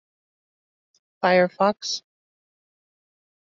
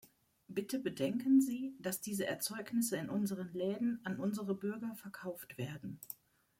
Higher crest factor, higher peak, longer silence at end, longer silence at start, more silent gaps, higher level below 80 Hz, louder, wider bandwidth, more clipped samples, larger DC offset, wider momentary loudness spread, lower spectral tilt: about the same, 22 dB vs 18 dB; first, -6 dBFS vs -20 dBFS; first, 1.5 s vs 0.45 s; first, 1.2 s vs 0.5 s; neither; about the same, -74 dBFS vs -78 dBFS; first, -22 LUFS vs -38 LUFS; second, 7.6 kHz vs 16.5 kHz; neither; neither; second, 10 LU vs 15 LU; second, -3 dB/octave vs -5 dB/octave